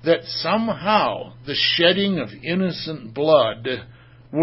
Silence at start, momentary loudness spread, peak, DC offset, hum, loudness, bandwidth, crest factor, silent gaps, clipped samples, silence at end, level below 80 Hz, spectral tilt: 0.05 s; 13 LU; -2 dBFS; under 0.1%; none; -20 LUFS; 5.8 kHz; 18 dB; none; under 0.1%; 0 s; -56 dBFS; -8.5 dB/octave